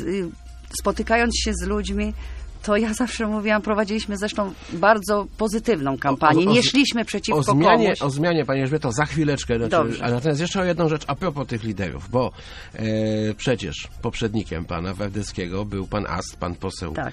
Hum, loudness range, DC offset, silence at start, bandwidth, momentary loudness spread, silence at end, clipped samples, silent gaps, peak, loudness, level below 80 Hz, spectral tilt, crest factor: none; 7 LU; under 0.1%; 0 s; 13.5 kHz; 11 LU; 0 s; under 0.1%; none; 0 dBFS; -22 LUFS; -38 dBFS; -5 dB/octave; 22 dB